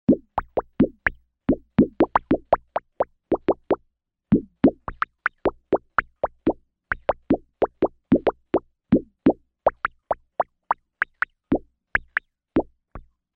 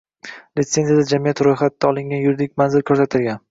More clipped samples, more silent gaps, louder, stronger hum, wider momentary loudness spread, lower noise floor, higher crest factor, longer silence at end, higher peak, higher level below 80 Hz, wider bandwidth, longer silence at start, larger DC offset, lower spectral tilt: neither; neither; second, -25 LUFS vs -18 LUFS; neither; about the same, 8 LU vs 7 LU; first, -70 dBFS vs -39 dBFS; about the same, 20 dB vs 16 dB; first, 0.35 s vs 0.1 s; about the same, -4 dBFS vs -2 dBFS; first, -44 dBFS vs -56 dBFS; second, 5 kHz vs 7.8 kHz; second, 0.1 s vs 0.25 s; neither; first, -10.5 dB/octave vs -6 dB/octave